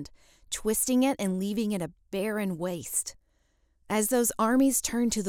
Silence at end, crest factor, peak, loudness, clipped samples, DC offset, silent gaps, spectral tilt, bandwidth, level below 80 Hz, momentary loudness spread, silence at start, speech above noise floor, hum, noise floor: 0 s; 16 dB; -12 dBFS; -28 LUFS; under 0.1%; under 0.1%; none; -4 dB/octave; 18 kHz; -56 dBFS; 10 LU; 0 s; 41 dB; none; -69 dBFS